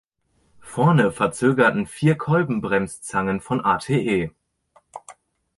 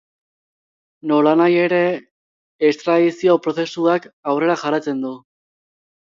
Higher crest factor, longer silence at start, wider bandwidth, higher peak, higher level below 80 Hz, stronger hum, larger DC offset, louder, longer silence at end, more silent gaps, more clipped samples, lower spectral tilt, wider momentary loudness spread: about the same, 20 dB vs 16 dB; second, 0.65 s vs 1.05 s; first, 11.5 kHz vs 7.6 kHz; about the same, -2 dBFS vs -4 dBFS; first, -54 dBFS vs -68 dBFS; neither; neither; second, -21 LUFS vs -18 LUFS; second, 0.45 s vs 0.95 s; second, none vs 2.11-2.59 s, 4.13-4.23 s; neither; about the same, -6.5 dB/octave vs -6.5 dB/octave; first, 14 LU vs 11 LU